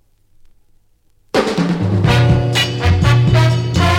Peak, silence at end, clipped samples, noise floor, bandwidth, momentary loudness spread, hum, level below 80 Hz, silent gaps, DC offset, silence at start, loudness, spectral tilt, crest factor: 0 dBFS; 0 s; under 0.1%; -54 dBFS; 14 kHz; 5 LU; none; -30 dBFS; none; under 0.1%; 1.35 s; -14 LUFS; -6 dB/octave; 14 dB